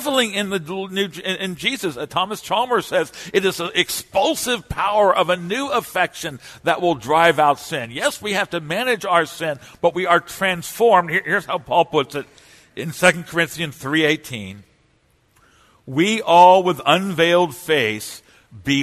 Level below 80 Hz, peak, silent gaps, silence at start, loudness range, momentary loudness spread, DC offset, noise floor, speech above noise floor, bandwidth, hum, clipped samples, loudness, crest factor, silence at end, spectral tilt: -54 dBFS; 0 dBFS; none; 0 s; 5 LU; 11 LU; under 0.1%; -60 dBFS; 41 dB; 13.5 kHz; none; under 0.1%; -19 LUFS; 20 dB; 0 s; -3.5 dB/octave